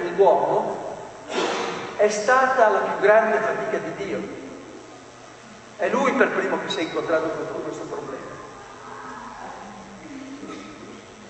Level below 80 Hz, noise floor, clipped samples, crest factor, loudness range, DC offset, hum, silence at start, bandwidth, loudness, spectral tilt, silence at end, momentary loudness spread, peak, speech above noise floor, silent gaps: -62 dBFS; -44 dBFS; under 0.1%; 20 dB; 14 LU; under 0.1%; none; 0 s; 9.2 kHz; -22 LUFS; -4 dB/octave; 0 s; 22 LU; -4 dBFS; 22 dB; none